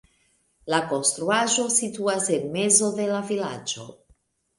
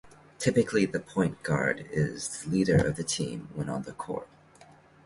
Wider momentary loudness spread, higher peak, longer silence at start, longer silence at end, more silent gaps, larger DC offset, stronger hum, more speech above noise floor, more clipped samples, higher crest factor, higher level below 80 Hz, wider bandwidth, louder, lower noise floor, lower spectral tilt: about the same, 12 LU vs 11 LU; first, -4 dBFS vs -10 dBFS; first, 0.65 s vs 0.05 s; second, 0.65 s vs 0.8 s; neither; neither; neither; first, 42 dB vs 27 dB; neither; about the same, 22 dB vs 20 dB; second, -68 dBFS vs -54 dBFS; about the same, 11.5 kHz vs 11.5 kHz; first, -23 LUFS vs -29 LUFS; first, -66 dBFS vs -56 dBFS; second, -2.5 dB/octave vs -5.5 dB/octave